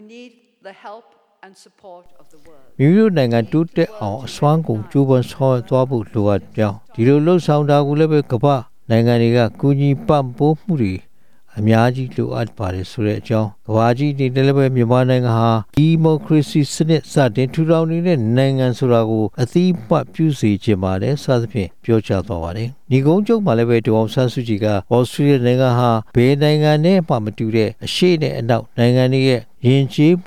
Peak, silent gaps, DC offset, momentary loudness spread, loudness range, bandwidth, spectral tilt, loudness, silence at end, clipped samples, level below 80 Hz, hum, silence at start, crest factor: -2 dBFS; none; 1%; 7 LU; 4 LU; 14 kHz; -7.5 dB/octave; -16 LUFS; 0.05 s; under 0.1%; -50 dBFS; none; 0 s; 14 dB